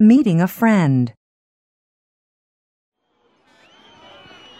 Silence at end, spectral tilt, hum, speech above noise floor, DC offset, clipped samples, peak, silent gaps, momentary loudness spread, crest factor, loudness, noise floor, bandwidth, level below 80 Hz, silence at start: 3.5 s; -8 dB/octave; none; 49 dB; under 0.1%; under 0.1%; -2 dBFS; none; 7 LU; 18 dB; -16 LUFS; -63 dBFS; 16 kHz; -64 dBFS; 0 s